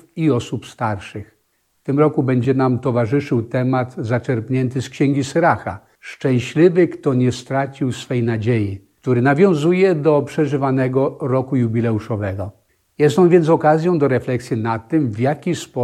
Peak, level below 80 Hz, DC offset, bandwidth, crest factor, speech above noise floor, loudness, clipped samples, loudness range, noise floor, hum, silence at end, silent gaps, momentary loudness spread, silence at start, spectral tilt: -2 dBFS; -56 dBFS; under 0.1%; 12 kHz; 16 dB; 48 dB; -18 LUFS; under 0.1%; 3 LU; -65 dBFS; none; 0 s; none; 10 LU; 0.15 s; -7.5 dB/octave